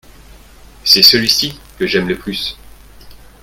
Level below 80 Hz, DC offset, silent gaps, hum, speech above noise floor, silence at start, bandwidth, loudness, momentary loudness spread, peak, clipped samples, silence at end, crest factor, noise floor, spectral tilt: -42 dBFS; under 0.1%; none; none; 26 dB; 0.85 s; over 20 kHz; -11 LUFS; 16 LU; 0 dBFS; 0.2%; 0.3 s; 16 dB; -40 dBFS; -2.5 dB/octave